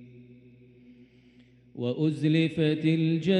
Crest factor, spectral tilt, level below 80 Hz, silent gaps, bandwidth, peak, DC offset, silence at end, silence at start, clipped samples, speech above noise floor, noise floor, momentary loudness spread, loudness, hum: 16 dB; -8 dB/octave; -68 dBFS; none; 9 kHz; -12 dBFS; under 0.1%; 0 s; 0 s; under 0.1%; 32 dB; -57 dBFS; 9 LU; -26 LUFS; none